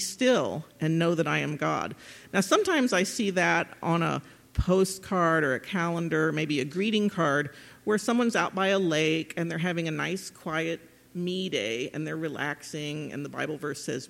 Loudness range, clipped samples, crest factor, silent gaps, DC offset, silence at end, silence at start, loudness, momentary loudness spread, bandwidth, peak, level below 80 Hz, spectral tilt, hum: 6 LU; under 0.1%; 20 dB; none; under 0.1%; 0.05 s; 0 s; -28 LUFS; 10 LU; 16.5 kHz; -8 dBFS; -48 dBFS; -5 dB/octave; none